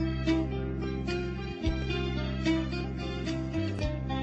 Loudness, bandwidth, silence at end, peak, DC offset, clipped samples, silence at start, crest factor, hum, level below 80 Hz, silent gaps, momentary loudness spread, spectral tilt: -32 LUFS; 8.2 kHz; 0 s; -14 dBFS; under 0.1%; under 0.1%; 0 s; 16 dB; none; -38 dBFS; none; 5 LU; -7 dB/octave